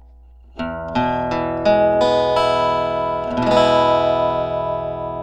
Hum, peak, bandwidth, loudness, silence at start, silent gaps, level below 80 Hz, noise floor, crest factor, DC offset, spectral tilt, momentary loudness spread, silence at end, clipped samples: none; -2 dBFS; 9.4 kHz; -18 LUFS; 0.55 s; none; -42 dBFS; -44 dBFS; 18 dB; under 0.1%; -6 dB/octave; 9 LU; 0 s; under 0.1%